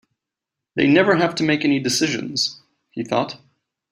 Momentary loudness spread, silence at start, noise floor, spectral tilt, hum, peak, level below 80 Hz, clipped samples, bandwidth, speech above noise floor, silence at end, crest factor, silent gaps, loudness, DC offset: 15 LU; 0.75 s; -85 dBFS; -4 dB/octave; none; -2 dBFS; -62 dBFS; under 0.1%; 15.5 kHz; 66 dB; 0.55 s; 18 dB; none; -19 LUFS; under 0.1%